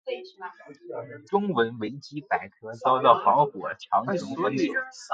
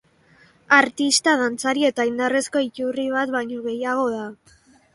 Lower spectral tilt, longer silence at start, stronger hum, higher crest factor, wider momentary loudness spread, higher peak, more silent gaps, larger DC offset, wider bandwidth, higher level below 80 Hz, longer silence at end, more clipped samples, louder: first, -5.5 dB/octave vs -2 dB/octave; second, 0.05 s vs 0.7 s; neither; about the same, 24 dB vs 22 dB; first, 19 LU vs 10 LU; second, -4 dBFS vs 0 dBFS; neither; neither; second, 9 kHz vs 11.5 kHz; second, -72 dBFS vs -66 dBFS; second, 0 s vs 0.6 s; neither; second, -25 LUFS vs -21 LUFS